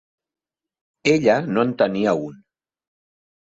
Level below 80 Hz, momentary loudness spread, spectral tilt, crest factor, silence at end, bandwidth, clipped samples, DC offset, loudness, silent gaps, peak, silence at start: -62 dBFS; 8 LU; -6 dB/octave; 18 dB; 1.15 s; 7.8 kHz; under 0.1%; under 0.1%; -20 LUFS; none; -4 dBFS; 1.05 s